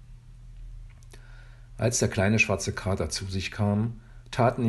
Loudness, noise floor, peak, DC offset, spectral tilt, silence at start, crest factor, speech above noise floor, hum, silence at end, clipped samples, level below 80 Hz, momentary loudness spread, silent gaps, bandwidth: -27 LUFS; -46 dBFS; -10 dBFS; under 0.1%; -5 dB/octave; 0 s; 18 dB; 21 dB; none; 0 s; under 0.1%; -46 dBFS; 24 LU; none; 12.5 kHz